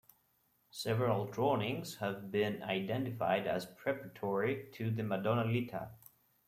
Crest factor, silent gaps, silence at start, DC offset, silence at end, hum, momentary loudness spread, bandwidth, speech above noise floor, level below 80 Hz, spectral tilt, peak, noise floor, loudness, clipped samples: 20 dB; none; 0.75 s; under 0.1%; 0.5 s; none; 7 LU; 16 kHz; 40 dB; -72 dBFS; -6.5 dB/octave; -16 dBFS; -75 dBFS; -36 LUFS; under 0.1%